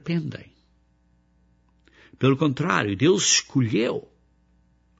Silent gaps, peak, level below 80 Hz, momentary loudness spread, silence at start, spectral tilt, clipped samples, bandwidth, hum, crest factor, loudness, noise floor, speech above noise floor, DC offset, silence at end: none; -4 dBFS; -62 dBFS; 13 LU; 0.05 s; -4 dB/octave; under 0.1%; 8 kHz; none; 22 dB; -22 LUFS; -63 dBFS; 41 dB; under 0.1%; 1 s